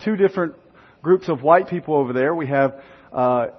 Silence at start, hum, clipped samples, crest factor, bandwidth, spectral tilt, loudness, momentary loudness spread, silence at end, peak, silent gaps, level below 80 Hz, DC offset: 0 s; none; under 0.1%; 18 dB; 6.2 kHz; -9 dB/octave; -20 LUFS; 10 LU; 0.05 s; -2 dBFS; none; -62 dBFS; under 0.1%